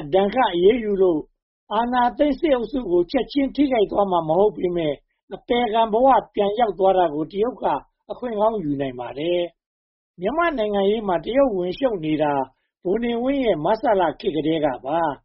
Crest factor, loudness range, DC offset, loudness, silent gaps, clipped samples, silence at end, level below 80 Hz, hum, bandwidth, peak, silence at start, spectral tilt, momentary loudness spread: 16 dB; 3 LU; under 0.1%; -21 LUFS; 1.42-1.67 s, 5.23-5.28 s, 9.66-10.14 s; under 0.1%; 0.1 s; -48 dBFS; none; 5.8 kHz; -6 dBFS; 0 s; -4.5 dB/octave; 9 LU